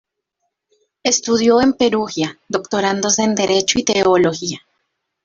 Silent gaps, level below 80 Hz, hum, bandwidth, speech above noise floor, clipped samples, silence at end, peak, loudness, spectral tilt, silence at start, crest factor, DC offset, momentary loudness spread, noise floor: none; -52 dBFS; none; 7.8 kHz; 58 dB; under 0.1%; 0.65 s; -2 dBFS; -16 LUFS; -3 dB/octave; 1.05 s; 16 dB; under 0.1%; 10 LU; -74 dBFS